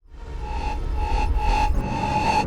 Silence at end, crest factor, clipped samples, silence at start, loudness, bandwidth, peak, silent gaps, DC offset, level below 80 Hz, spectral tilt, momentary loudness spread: 0 s; 12 dB; under 0.1%; 0.1 s; -25 LUFS; 11.5 kHz; -10 dBFS; none; under 0.1%; -26 dBFS; -5.5 dB/octave; 10 LU